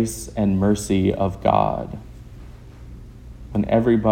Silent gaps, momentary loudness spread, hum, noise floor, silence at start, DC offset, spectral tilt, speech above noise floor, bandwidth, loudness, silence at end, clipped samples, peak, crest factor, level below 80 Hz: none; 23 LU; 60 Hz at -45 dBFS; -40 dBFS; 0 s; under 0.1%; -6.5 dB/octave; 20 dB; 16.5 kHz; -21 LUFS; 0 s; under 0.1%; -4 dBFS; 18 dB; -40 dBFS